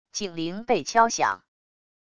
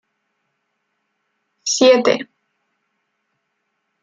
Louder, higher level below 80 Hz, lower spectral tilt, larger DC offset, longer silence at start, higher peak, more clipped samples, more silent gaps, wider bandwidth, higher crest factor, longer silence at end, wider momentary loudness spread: second, -24 LUFS vs -15 LUFS; first, -62 dBFS vs -70 dBFS; about the same, -3 dB/octave vs -2 dB/octave; neither; second, 0.15 s vs 1.65 s; second, -6 dBFS vs -2 dBFS; neither; neither; first, 11 kHz vs 9 kHz; about the same, 20 dB vs 20 dB; second, 0.8 s vs 1.8 s; second, 11 LU vs 16 LU